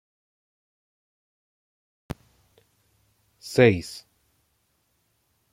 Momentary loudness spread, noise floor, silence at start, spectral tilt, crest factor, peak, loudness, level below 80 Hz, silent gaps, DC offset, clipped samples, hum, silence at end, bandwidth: 23 LU; -71 dBFS; 3.45 s; -6 dB/octave; 28 dB; -2 dBFS; -21 LUFS; -60 dBFS; none; under 0.1%; under 0.1%; none; 1.55 s; 16 kHz